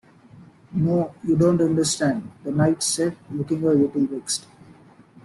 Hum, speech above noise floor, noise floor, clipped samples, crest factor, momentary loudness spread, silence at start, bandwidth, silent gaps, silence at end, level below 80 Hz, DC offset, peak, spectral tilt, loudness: none; 28 dB; -50 dBFS; under 0.1%; 16 dB; 9 LU; 0.35 s; 12.5 kHz; none; 0.85 s; -56 dBFS; under 0.1%; -6 dBFS; -5.5 dB/octave; -22 LUFS